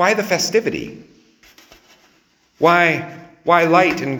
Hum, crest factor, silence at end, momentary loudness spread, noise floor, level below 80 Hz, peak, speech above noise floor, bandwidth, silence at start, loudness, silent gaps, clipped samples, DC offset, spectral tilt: none; 18 dB; 0 s; 15 LU; -58 dBFS; -58 dBFS; 0 dBFS; 42 dB; over 20 kHz; 0 s; -16 LUFS; none; under 0.1%; under 0.1%; -4 dB/octave